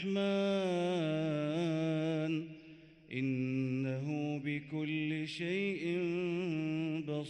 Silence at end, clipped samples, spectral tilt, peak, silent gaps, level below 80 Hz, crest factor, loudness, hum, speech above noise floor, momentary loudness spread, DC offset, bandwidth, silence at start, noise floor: 0 s; under 0.1%; -7 dB/octave; -24 dBFS; none; -74 dBFS; 12 dB; -36 LUFS; none; 23 dB; 5 LU; under 0.1%; 9.2 kHz; 0 s; -56 dBFS